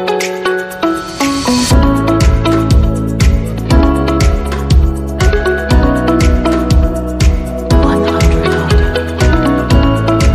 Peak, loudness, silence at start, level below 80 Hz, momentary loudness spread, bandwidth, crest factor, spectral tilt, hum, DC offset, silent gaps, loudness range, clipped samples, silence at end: 0 dBFS; -12 LUFS; 0 s; -14 dBFS; 5 LU; 14.5 kHz; 10 dB; -6 dB/octave; none; under 0.1%; none; 1 LU; under 0.1%; 0 s